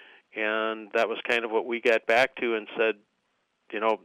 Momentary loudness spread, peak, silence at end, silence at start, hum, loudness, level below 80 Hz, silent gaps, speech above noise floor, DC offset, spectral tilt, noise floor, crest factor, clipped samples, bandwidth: 8 LU; -12 dBFS; 0.1 s; 0.35 s; none; -26 LUFS; -76 dBFS; none; 48 dB; under 0.1%; -3.5 dB/octave; -74 dBFS; 16 dB; under 0.1%; 15 kHz